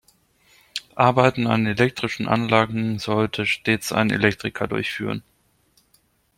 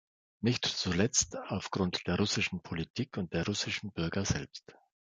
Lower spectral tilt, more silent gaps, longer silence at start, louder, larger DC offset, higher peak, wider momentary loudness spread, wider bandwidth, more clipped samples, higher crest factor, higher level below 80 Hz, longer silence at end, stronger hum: first, -5.5 dB/octave vs -3.5 dB/octave; second, none vs 2.90-2.94 s; first, 0.75 s vs 0.4 s; first, -21 LUFS vs -33 LUFS; neither; first, -2 dBFS vs -10 dBFS; about the same, 10 LU vs 9 LU; first, 16.5 kHz vs 10 kHz; neither; about the same, 22 dB vs 22 dB; about the same, -56 dBFS vs -52 dBFS; first, 1.2 s vs 0.4 s; neither